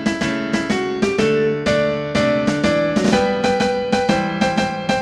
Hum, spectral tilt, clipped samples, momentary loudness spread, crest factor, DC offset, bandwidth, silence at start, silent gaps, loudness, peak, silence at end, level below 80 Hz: none; -5 dB/octave; under 0.1%; 3 LU; 16 dB; under 0.1%; 12 kHz; 0 s; none; -18 LUFS; -2 dBFS; 0 s; -44 dBFS